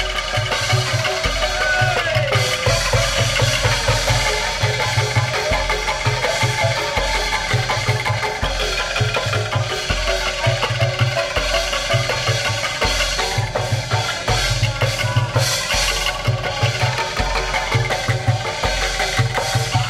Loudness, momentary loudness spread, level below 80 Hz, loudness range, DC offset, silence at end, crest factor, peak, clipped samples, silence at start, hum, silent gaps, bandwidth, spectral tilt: -18 LUFS; 3 LU; -30 dBFS; 2 LU; under 0.1%; 0 s; 14 dB; -4 dBFS; under 0.1%; 0 s; none; none; 16 kHz; -3 dB/octave